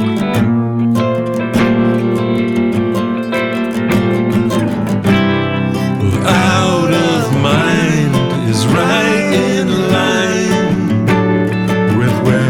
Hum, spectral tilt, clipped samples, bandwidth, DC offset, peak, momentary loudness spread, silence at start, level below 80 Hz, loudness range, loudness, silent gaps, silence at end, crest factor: none; -6 dB/octave; under 0.1%; 18 kHz; under 0.1%; 0 dBFS; 4 LU; 0 s; -40 dBFS; 2 LU; -13 LUFS; none; 0 s; 12 dB